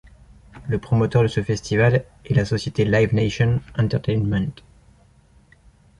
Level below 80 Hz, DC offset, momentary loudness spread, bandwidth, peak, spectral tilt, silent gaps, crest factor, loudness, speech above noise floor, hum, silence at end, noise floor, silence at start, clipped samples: -42 dBFS; under 0.1%; 7 LU; 11 kHz; -4 dBFS; -7 dB/octave; none; 16 dB; -21 LUFS; 34 dB; none; 1.45 s; -54 dBFS; 0.55 s; under 0.1%